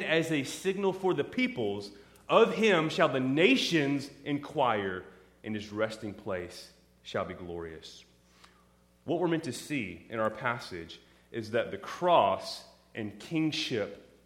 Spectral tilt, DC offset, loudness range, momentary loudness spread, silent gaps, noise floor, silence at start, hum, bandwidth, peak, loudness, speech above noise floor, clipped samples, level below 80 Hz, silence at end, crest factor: -5 dB/octave; under 0.1%; 11 LU; 19 LU; none; -64 dBFS; 0 s; 60 Hz at -65 dBFS; 16 kHz; -8 dBFS; -30 LUFS; 34 dB; under 0.1%; -66 dBFS; 0.25 s; 22 dB